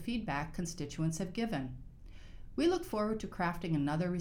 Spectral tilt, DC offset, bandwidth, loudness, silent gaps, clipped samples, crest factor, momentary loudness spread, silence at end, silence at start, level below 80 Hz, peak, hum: -6 dB/octave; under 0.1%; 19.5 kHz; -36 LUFS; none; under 0.1%; 16 dB; 20 LU; 0 s; 0 s; -52 dBFS; -20 dBFS; none